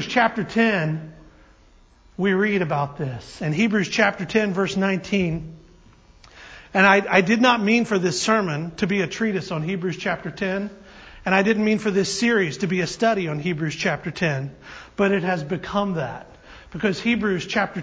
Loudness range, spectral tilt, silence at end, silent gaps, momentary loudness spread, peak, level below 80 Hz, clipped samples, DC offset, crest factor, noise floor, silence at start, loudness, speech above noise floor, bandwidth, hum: 5 LU; -5 dB/octave; 0 s; none; 13 LU; -2 dBFS; -52 dBFS; under 0.1%; under 0.1%; 20 dB; -53 dBFS; 0 s; -22 LUFS; 31 dB; 8 kHz; none